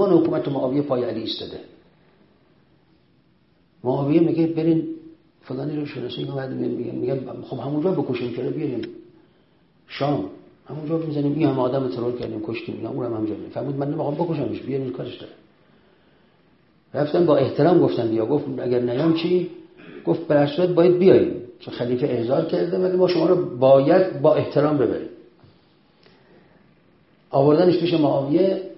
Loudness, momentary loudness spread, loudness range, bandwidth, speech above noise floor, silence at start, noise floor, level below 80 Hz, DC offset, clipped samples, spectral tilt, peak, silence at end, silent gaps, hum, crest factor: -21 LUFS; 14 LU; 9 LU; 5.8 kHz; 40 dB; 0 s; -60 dBFS; -60 dBFS; under 0.1%; under 0.1%; -11 dB/octave; -2 dBFS; 0.05 s; none; none; 20 dB